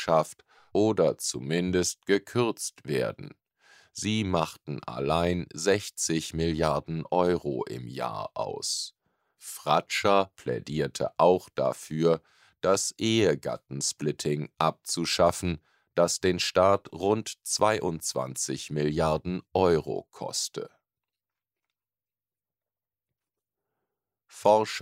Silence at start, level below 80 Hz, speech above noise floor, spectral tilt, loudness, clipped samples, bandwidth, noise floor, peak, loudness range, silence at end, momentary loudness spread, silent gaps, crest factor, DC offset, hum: 0 s; -56 dBFS; over 63 dB; -4 dB/octave; -28 LUFS; under 0.1%; 16 kHz; under -90 dBFS; -8 dBFS; 4 LU; 0 s; 10 LU; none; 20 dB; under 0.1%; none